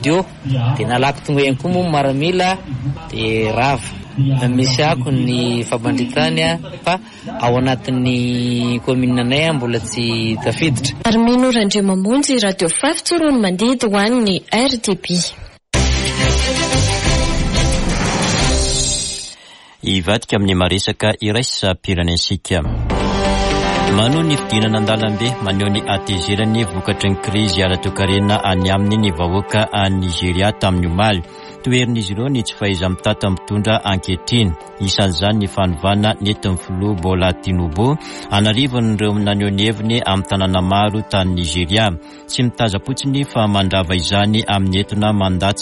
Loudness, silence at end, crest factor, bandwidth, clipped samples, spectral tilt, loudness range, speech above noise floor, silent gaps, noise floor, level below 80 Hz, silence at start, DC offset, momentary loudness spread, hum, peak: -16 LUFS; 0 s; 14 dB; 11.5 kHz; under 0.1%; -5 dB/octave; 2 LU; 26 dB; none; -42 dBFS; -30 dBFS; 0 s; under 0.1%; 5 LU; none; -2 dBFS